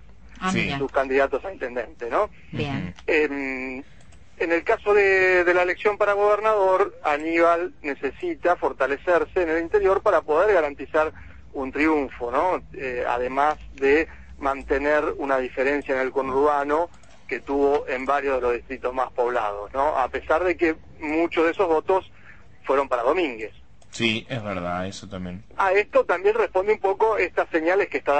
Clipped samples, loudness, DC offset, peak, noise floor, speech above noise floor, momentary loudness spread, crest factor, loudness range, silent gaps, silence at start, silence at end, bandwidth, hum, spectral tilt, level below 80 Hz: under 0.1%; -23 LUFS; 0.5%; -8 dBFS; -50 dBFS; 27 dB; 10 LU; 16 dB; 5 LU; none; 0.25 s; 0 s; 8.6 kHz; none; -5.5 dB/octave; -48 dBFS